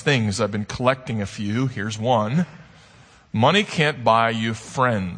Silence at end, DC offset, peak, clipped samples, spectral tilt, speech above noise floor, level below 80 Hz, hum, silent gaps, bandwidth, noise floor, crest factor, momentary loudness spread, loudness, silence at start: 0 s; under 0.1%; -2 dBFS; under 0.1%; -5.5 dB/octave; 29 dB; -54 dBFS; none; none; 9.8 kHz; -50 dBFS; 20 dB; 8 LU; -21 LUFS; 0 s